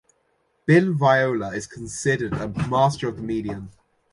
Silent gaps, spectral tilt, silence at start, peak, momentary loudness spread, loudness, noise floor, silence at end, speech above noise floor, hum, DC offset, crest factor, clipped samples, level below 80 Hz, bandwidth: none; -6 dB/octave; 0.65 s; -4 dBFS; 14 LU; -22 LUFS; -68 dBFS; 0.4 s; 46 dB; none; under 0.1%; 18 dB; under 0.1%; -50 dBFS; 11.5 kHz